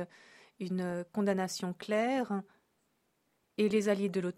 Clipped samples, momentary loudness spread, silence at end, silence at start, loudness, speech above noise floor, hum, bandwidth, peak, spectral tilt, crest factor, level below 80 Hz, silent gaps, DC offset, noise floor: under 0.1%; 10 LU; 0.05 s; 0 s; -33 LUFS; 44 dB; none; 14.5 kHz; -18 dBFS; -6 dB/octave; 16 dB; -78 dBFS; none; under 0.1%; -77 dBFS